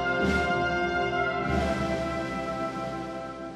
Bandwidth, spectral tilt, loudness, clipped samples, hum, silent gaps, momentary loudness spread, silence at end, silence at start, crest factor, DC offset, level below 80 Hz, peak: 13 kHz; -6 dB/octave; -28 LUFS; under 0.1%; none; none; 9 LU; 0 s; 0 s; 14 dB; under 0.1%; -42 dBFS; -14 dBFS